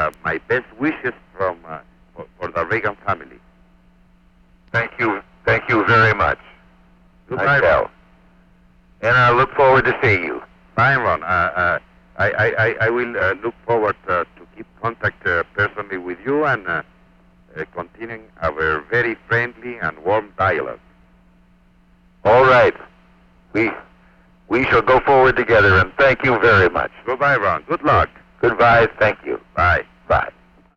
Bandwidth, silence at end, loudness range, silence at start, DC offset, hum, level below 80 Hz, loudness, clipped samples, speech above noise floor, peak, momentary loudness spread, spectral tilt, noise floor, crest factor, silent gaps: 7.6 kHz; 0.45 s; 9 LU; 0 s; under 0.1%; none; -42 dBFS; -17 LUFS; under 0.1%; 36 dB; -4 dBFS; 14 LU; -7 dB/octave; -53 dBFS; 14 dB; none